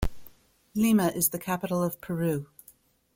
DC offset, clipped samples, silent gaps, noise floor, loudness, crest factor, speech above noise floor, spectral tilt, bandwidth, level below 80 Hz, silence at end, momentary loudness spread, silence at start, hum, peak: under 0.1%; under 0.1%; none; -59 dBFS; -27 LUFS; 20 dB; 33 dB; -5.5 dB/octave; 16.5 kHz; -44 dBFS; 0.7 s; 13 LU; 0 s; none; -10 dBFS